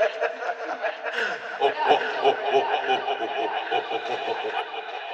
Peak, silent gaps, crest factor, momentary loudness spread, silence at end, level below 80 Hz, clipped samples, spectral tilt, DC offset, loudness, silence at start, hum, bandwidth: -6 dBFS; none; 20 dB; 8 LU; 0 s; -78 dBFS; under 0.1%; -3 dB/octave; under 0.1%; -26 LUFS; 0 s; none; 8.6 kHz